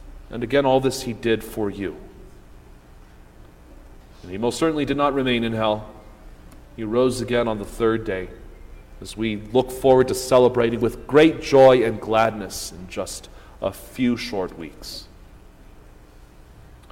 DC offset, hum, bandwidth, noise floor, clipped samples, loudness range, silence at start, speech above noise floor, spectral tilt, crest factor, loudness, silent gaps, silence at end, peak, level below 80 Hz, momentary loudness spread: under 0.1%; none; 16.5 kHz; -46 dBFS; under 0.1%; 12 LU; 0 s; 26 dB; -5.5 dB/octave; 20 dB; -21 LUFS; none; 0.3 s; -4 dBFS; -44 dBFS; 19 LU